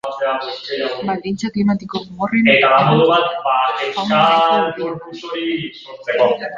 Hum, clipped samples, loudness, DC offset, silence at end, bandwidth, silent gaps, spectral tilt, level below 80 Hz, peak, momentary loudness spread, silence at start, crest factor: none; under 0.1%; -16 LUFS; under 0.1%; 0 s; 7.6 kHz; none; -6 dB/octave; -58 dBFS; 0 dBFS; 13 LU; 0.05 s; 16 dB